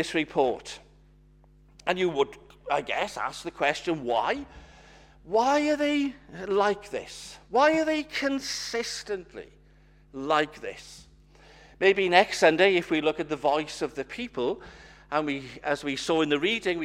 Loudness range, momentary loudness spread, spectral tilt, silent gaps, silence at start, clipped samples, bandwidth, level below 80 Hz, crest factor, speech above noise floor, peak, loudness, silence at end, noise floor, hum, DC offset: 6 LU; 17 LU; -4 dB/octave; none; 0 s; under 0.1%; 15.5 kHz; -58 dBFS; 24 dB; 30 dB; -2 dBFS; -26 LUFS; 0 s; -57 dBFS; 50 Hz at -55 dBFS; under 0.1%